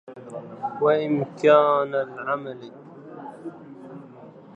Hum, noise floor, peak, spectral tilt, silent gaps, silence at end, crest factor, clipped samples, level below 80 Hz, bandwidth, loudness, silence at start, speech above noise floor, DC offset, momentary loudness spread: none; -45 dBFS; -4 dBFS; -7 dB/octave; none; 0.25 s; 20 dB; under 0.1%; -76 dBFS; 8.4 kHz; -22 LUFS; 0.1 s; 23 dB; under 0.1%; 25 LU